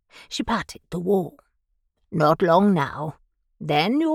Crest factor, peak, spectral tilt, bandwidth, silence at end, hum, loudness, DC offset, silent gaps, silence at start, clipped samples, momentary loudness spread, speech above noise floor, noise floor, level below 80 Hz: 18 dB; -6 dBFS; -6.5 dB/octave; 14.5 kHz; 0 s; none; -22 LUFS; under 0.1%; none; 0.15 s; under 0.1%; 15 LU; 50 dB; -71 dBFS; -54 dBFS